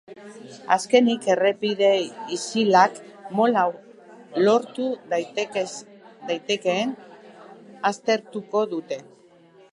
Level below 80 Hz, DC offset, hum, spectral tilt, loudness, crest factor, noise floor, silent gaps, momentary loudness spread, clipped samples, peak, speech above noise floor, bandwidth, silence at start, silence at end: -78 dBFS; under 0.1%; none; -4 dB/octave; -23 LUFS; 20 dB; -53 dBFS; none; 19 LU; under 0.1%; -2 dBFS; 30 dB; 11.5 kHz; 0.1 s; 0.7 s